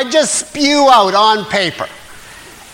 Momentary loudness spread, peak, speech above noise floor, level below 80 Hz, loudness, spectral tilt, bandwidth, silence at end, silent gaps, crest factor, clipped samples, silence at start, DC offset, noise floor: 12 LU; 0 dBFS; 24 dB; -50 dBFS; -11 LUFS; -2 dB/octave; 16.5 kHz; 0.25 s; none; 14 dB; under 0.1%; 0 s; under 0.1%; -36 dBFS